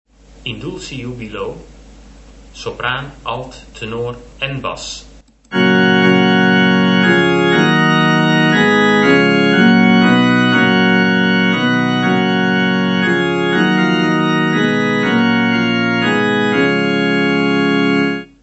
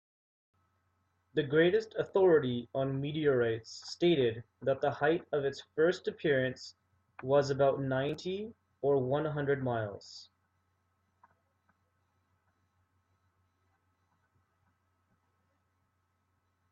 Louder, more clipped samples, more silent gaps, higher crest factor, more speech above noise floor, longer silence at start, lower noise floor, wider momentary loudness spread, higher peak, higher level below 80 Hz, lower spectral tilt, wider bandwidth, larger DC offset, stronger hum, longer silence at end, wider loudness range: first, -13 LUFS vs -31 LUFS; neither; neither; about the same, 14 dB vs 18 dB; second, 15 dB vs 47 dB; second, 0.45 s vs 1.35 s; second, -39 dBFS vs -78 dBFS; about the same, 15 LU vs 14 LU; first, 0 dBFS vs -16 dBFS; first, -46 dBFS vs -72 dBFS; about the same, -6 dB/octave vs -6.5 dB/octave; about the same, 8.2 kHz vs 7.8 kHz; neither; neither; second, 0.2 s vs 6.5 s; first, 14 LU vs 6 LU